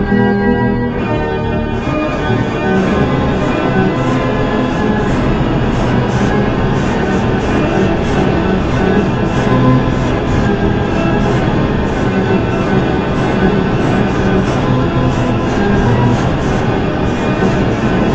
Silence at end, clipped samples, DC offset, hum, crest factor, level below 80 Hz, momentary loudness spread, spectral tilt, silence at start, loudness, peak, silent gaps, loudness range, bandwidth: 0 s; under 0.1%; under 0.1%; none; 12 dB; -24 dBFS; 3 LU; -7.5 dB/octave; 0 s; -14 LUFS; 0 dBFS; none; 1 LU; 8.2 kHz